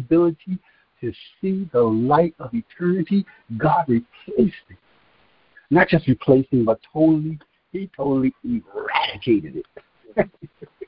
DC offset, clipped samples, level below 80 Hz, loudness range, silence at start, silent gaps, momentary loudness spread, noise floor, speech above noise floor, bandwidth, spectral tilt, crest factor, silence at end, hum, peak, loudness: under 0.1%; under 0.1%; -52 dBFS; 4 LU; 0 s; none; 15 LU; -59 dBFS; 38 dB; 5.4 kHz; -12 dB/octave; 20 dB; 0.05 s; none; -2 dBFS; -21 LUFS